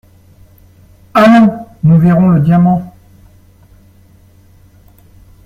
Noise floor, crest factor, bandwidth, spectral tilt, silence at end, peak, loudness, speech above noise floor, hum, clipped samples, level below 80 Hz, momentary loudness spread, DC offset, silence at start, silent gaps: -44 dBFS; 12 dB; 7 kHz; -9 dB/octave; 2.55 s; 0 dBFS; -9 LUFS; 36 dB; none; under 0.1%; -44 dBFS; 9 LU; under 0.1%; 1.15 s; none